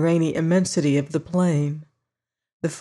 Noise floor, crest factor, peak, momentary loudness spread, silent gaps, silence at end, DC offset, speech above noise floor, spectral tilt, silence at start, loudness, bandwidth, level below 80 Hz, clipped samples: -86 dBFS; 14 dB; -8 dBFS; 10 LU; 2.53-2.60 s; 0 s; under 0.1%; 66 dB; -6.5 dB/octave; 0 s; -22 LUFS; 11.5 kHz; -62 dBFS; under 0.1%